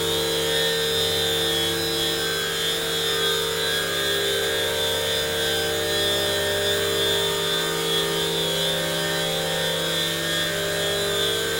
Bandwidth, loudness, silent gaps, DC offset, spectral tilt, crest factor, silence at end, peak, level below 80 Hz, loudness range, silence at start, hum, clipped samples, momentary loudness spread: 16.5 kHz; -22 LUFS; none; 0.1%; -2 dB/octave; 14 dB; 0 s; -10 dBFS; -54 dBFS; 1 LU; 0 s; none; under 0.1%; 2 LU